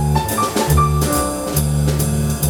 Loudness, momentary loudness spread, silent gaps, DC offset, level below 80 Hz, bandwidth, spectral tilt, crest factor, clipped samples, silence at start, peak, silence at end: -17 LUFS; 4 LU; none; under 0.1%; -24 dBFS; 18.5 kHz; -5 dB/octave; 16 dB; under 0.1%; 0 s; -2 dBFS; 0 s